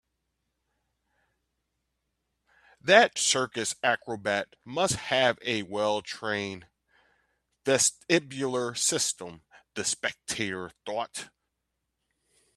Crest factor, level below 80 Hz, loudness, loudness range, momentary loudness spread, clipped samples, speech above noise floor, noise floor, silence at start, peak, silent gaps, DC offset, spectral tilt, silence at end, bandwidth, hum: 26 dB; -68 dBFS; -27 LUFS; 5 LU; 14 LU; under 0.1%; 54 dB; -82 dBFS; 2.85 s; -4 dBFS; none; under 0.1%; -2 dB/octave; 1.3 s; 14 kHz; none